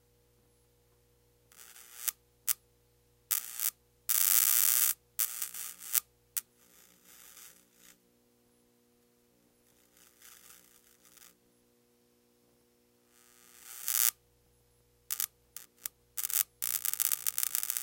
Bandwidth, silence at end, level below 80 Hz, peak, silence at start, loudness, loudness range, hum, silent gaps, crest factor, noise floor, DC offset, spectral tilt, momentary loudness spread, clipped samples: 17.5 kHz; 0 s; -78 dBFS; -2 dBFS; 1.6 s; -30 LUFS; 11 LU; 60 Hz at -75 dBFS; none; 34 dB; -69 dBFS; under 0.1%; 3 dB/octave; 26 LU; under 0.1%